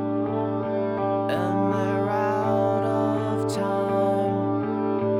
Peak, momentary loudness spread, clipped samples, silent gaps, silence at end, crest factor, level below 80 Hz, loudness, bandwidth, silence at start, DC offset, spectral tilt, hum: -12 dBFS; 3 LU; under 0.1%; none; 0 s; 12 dB; -60 dBFS; -24 LUFS; 14 kHz; 0 s; under 0.1%; -7.5 dB/octave; none